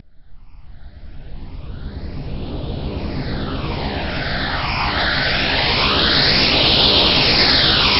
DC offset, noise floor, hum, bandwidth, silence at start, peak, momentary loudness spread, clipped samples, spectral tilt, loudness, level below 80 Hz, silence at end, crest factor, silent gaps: under 0.1%; -38 dBFS; none; 9.6 kHz; 0.05 s; 0 dBFS; 19 LU; under 0.1%; -5.5 dB/octave; -15 LUFS; -30 dBFS; 0 s; 18 dB; none